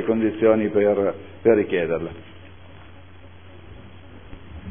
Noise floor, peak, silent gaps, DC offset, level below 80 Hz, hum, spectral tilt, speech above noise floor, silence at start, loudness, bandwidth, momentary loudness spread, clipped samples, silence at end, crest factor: -45 dBFS; -4 dBFS; none; 0.5%; -52 dBFS; none; -11 dB/octave; 25 dB; 0 s; -21 LUFS; 3.6 kHz; 24 LU; under 0.1%; 0 s; 18 dB